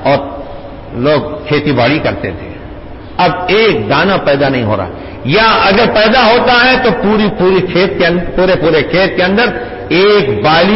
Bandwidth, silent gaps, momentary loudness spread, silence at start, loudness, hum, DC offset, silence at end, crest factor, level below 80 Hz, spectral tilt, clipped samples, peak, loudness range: 5.8 kHz; none; 16 LU; 0 s; -10 LUFS; none; under 0.1%; 0 s; 10 dB; -32 dBFS; -9 dB/octave; under 0.1%; 0 dBFS; 4 LU